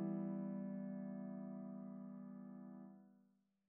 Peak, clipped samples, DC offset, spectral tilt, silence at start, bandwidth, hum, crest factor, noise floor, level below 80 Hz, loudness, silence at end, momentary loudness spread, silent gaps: -34 dBFS; under 0.1%; under 0.1%; -9 dB/octave; 0 s; 2.5 kHz; none; 16 dB; -77 dBFS; under -90 dBFS; -49 LUFS; 0.5 s; 12 LU; none